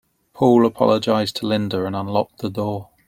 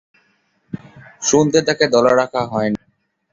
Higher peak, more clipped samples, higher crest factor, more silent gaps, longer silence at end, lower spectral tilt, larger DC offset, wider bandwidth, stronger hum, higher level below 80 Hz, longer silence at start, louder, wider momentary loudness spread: about the same, -2 dBFS vs 0 dBFS; neither; about the same, 18 dB vs 18 dB; neither; second, 0.25 s vs 0.55 s; first, -6.5 dB/octave vs -4 dB/octave; neither; first, 16 kHz vs 7.8 kHz; neither; about the same, -58 dBFS vs -54 dBFS; second, 0.35 s vs 0.75 s; second, -20 LUFS vs -16 LUFS; second, 10 LU vs 20 LU